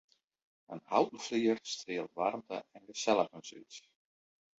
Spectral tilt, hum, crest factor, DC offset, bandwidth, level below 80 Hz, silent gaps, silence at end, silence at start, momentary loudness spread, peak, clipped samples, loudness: -3 dB/octave; none; 22 dB; under 0.1%; 8 kHz; -80 dBFS; none; 0.8 s; 0.7 s; 18 LU; -14 dBFS; under 0.1%; -34 LUFS